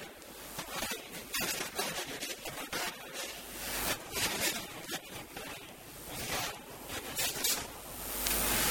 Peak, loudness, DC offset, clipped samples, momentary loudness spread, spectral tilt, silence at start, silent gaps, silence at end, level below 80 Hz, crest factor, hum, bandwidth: -10 dBFS; -35 LUFS; under 0.1%; under 0.1%; 13 LU; -1 dB/octave; 0 s; none; 0 s; -54 dBFS; 28 dB; none; over 20 kHz